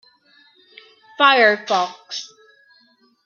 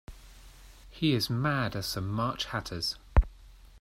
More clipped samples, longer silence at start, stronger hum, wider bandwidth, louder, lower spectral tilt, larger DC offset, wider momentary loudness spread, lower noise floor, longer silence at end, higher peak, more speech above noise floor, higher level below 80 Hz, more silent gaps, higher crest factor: neither; first, 1.2 s vs 0.1 s; neither; second, 7.2 kHz vs 16 kHz; first, -16 LUFS vs -31 LUFS; second, -2 dB/octave vs -5 dB/octave; neither; first, 18 LU vs 6 LU; first, -58 dBFS vs -52 dBFS; first, 1 s vs 0 s; first, -2 dBFS vs -10 dBFS; first, 41 dB vs 22 dB; second, -82 dBFS vs -36 dBFS; neither; about the same, 20 dB vs 20 dB